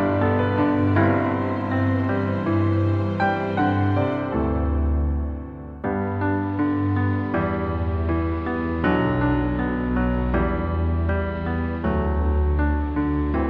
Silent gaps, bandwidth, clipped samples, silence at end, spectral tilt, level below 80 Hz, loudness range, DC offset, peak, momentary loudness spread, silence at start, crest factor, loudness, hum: none; 5 kHz; under 0.1%; 0 s; -10 dB/octave; -30 dBFS; 3 LU; under 0.1%; -6 dBFS; 5 LU; 0 s; 16 dB; -23 LUFS; none